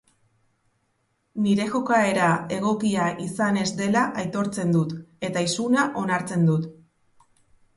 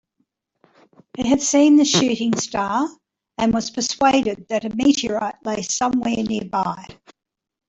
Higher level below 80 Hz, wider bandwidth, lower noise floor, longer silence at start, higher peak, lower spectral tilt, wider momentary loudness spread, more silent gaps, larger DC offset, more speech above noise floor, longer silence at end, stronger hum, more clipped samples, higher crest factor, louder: second, -64 dBFS vs -54 dBFS; first, 11.5 kHz vs 8.4 kHz; about the same, -71 dBFS vs -71 dBFS; first, 1.35 s vs 1.2 s; second, -8 dBFS vs -4 dBFS; first, -5.5 dB/octave vs -3.5 dB/octave; second, 6 LU vs 12 LU; neither; neither; second, 48 dB vs 52 dB; first, 1.05 s vs 0.75 s; neither; neither; about the same, 16 dB vs 16 dB; second, -23 LUFS vs -19 LUFS